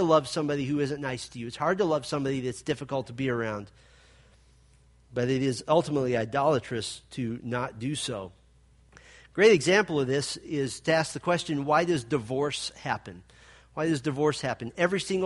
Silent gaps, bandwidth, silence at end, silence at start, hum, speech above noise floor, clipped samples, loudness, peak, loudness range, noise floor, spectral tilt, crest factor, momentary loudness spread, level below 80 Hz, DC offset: none; 11.5 kHz; 0 s; 0 s; none; 32 dB; under 0.1%; -28 LUFS; -8 dBFS; 6 LU; -59 dBFS; -5 dB/octave; 20 dB; 11 LU; -60 dBFS; under 0.1%